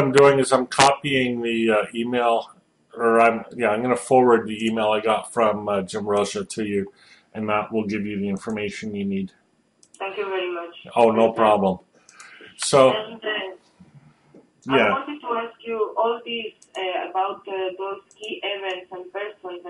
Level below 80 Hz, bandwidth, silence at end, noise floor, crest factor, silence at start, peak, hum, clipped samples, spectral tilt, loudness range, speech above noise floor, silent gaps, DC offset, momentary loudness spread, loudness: -62 dBFS; 11.5 kHz; 0 s; -60 dBFS; 20 dB; 0 s; -4 dBFS; none; under 0.1%; -4.5 dB/octave; 7 LU; 39 dB; none; under 0.1%; 15 LU; -22 LUFS